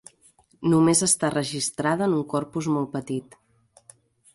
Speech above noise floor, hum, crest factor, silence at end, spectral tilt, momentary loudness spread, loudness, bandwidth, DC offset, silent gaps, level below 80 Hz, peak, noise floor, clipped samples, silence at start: 36 dB; none; 20 dB; 1.1 s; -4.5 dB/octave; 11 LU; -23 LUFS; 11.5 kHz; under 0.1%; none; -62 dBFS; -6 dBFS; -60 dBFS; under 0.1%; 0.6 s